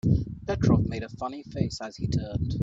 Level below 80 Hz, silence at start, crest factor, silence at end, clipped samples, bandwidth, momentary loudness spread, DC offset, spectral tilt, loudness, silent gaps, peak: -40 dBFS; 0.05 s; 18 dB; 0 s; under 0.1%; 7.8 kHz; 11 LU; under 0.1%; -7.5 dB/octave; -28 LUFS; none; -8 dBFS